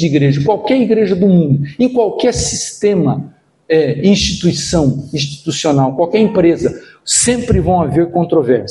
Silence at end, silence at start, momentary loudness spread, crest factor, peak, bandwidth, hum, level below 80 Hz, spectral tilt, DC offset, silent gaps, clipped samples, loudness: 0 s; 0 s; 6 LU; 12 dB; 0 dBFS; 11.5 kHz; none; -34 dBFS; -5 dB/octave; under 0.1%; none; under 0.1%; -13 LUFS